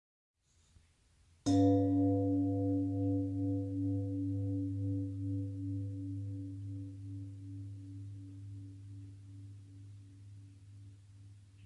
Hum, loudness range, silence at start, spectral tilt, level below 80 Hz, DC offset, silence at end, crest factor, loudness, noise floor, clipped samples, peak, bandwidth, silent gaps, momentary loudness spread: none; 18 LU; 1.45 s; -9 dB/octave; -70 dBFS; under 0.1%; 0 s; 18 dB; -36 LUFS; -68 dBFS; under 0.1%; -18 dBFS; 9.6 kHz; none; 24 LU